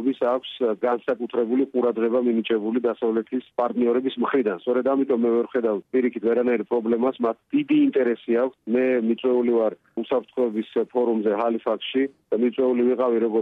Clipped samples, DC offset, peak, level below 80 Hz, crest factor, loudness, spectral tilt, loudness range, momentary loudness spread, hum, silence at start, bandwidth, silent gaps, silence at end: under 0.1%; under 0.1%; -10 dBFS; -72 dBFS; 12 dB; -23 LUFS; -8.5 dB/octave; 1 LU; 5 LU; none; 0 s; 4.1 kHz; none; 0 s